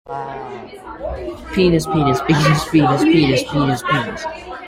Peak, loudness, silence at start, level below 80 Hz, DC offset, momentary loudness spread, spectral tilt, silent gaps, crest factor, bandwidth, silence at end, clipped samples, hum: -2 dBFS; -16 LUFS; 0.05 s; -38 dBFS; under 0.1%; 16 LU; -6 dB/octave; none; 14 dB; 16 kHz; 0 s; under 0.1%; none